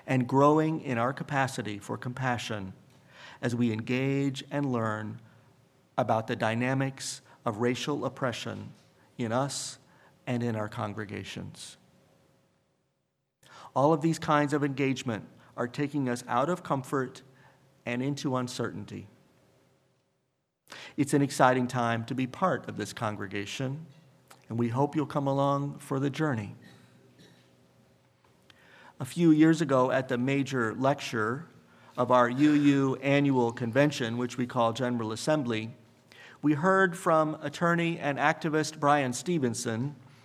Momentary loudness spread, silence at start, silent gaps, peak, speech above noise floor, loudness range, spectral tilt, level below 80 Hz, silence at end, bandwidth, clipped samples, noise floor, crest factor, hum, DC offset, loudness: 14 LU; 0.05 s; none; -6 dBFS; 51 dB; 9 LU; -6 dB/octave; -74 dBFS; 0.3 s; 14.5 kHz; under 0.1%; -79 dBFS; 24 dB; none; under 0.1%; -29 LUFS